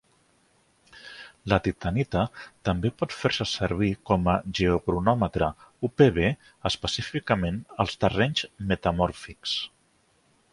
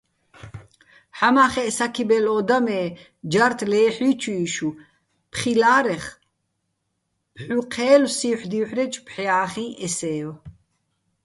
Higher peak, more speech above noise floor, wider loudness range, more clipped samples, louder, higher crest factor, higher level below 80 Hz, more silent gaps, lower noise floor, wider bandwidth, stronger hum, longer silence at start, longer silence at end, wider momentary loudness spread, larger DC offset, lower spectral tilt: about the same, -4 dBFS vs -2 dBFS; second, 40 dB vs 54 dB; about the same, 4 LU vs 4 LU; neither; second, -26 LUFS vs -21 LUFS; about the same, 22 dB vs 20 dB; first, -44 dBFS vs -58 dBFS; neither; second, -66 dBFS vs -75 dBFS; about the same, 11.5 kHz vs 11.5 kHz; neither; first, 0.95 s vs 0.45 s; about the same, 0.85 s vs 0.75 s; second, 9 LU vs 14 LU; neither; first, -6 dB/octave vs -4 dB/octave